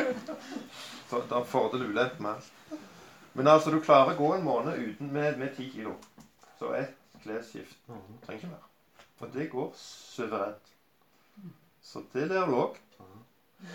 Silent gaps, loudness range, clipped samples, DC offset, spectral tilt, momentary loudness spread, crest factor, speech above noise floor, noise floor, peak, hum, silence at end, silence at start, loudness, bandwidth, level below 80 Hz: none; 14 LU; under 0.1%; under 0.1%; -6 dB/octave; 25 LU; 24 dB; 37 dB; -67 dBFS; -6 dBFS; none; 0 s; 0 s; -30 LUFS; 18 kHz; -78 dBFS